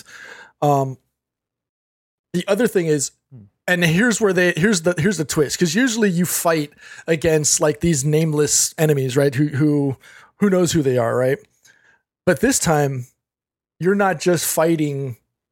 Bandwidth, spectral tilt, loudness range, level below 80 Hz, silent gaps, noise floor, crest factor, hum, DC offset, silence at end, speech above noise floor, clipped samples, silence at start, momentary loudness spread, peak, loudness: 17 kHz; -4.5 dB/octave; 4 LU; -50 dBFS; 1.69-2.24 s; under -90 dBFS; 18 dB; none; under 0.1%; 0.4 s; over 72 dB; under 0.1%; 0.1 s; 10 LU; -2 dBFS; -18 LUFS